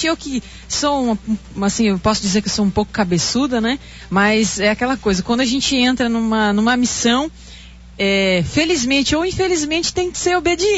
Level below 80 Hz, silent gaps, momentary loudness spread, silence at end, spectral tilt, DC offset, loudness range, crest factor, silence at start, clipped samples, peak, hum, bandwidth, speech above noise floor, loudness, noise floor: -38 dBFS; none; 6 LU; 0 s; -3.5 dB/octave; under 0.1%; 2 LU; 14 dB; 0 s; under 0.1%; -4 dBFS; none; 8 kHz; 21 dB; -17 LUFS; -38 dBFS